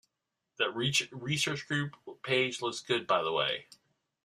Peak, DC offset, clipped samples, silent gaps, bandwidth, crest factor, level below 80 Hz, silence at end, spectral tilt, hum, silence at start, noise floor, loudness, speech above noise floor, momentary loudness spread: -12 dBFS; under 0.1%; under 0.1%; none; 14.5 kHz; 20 dB; -72 dBFS; 0.6 s; -3.5 dB/octave; none; 0.6 s; -86 dBFS; -31 LUFS; 54 dB; 7 LU